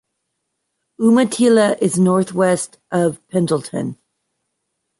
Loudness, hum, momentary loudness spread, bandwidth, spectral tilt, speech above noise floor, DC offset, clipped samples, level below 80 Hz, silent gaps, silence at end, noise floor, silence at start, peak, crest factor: -17 LUFS; none; 9 LU; 11.5 kHz; -5.5 dB/octave; 59 dB; under 0.1%; under 0.1%; -62 dBFS; none; 1.05 s; -75 dBFS; 1 s; -4 dBFS; 14 dB